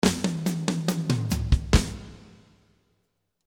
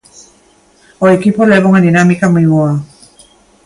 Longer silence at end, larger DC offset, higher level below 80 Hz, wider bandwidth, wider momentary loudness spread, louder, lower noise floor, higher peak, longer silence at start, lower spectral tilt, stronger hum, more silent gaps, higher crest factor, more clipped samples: first, 1.3 s vs 0.8 s; neither; first, -32 dBFS vs -50 dBFS; first, 18 kHz vs 11.5 kHz; first, 13 LU vs 6 LU; second, -26 LUFS vs -10 LUFS; first, -75 dBFS vs -48 dBFS; about the same, -2 dBFS vs 0 dBFS; second, 0.05 s vs 1 s; second, -5 dB/octave vs -7.5 dB/octave; neither; neither; first, 24 dB vs 12 dB; neither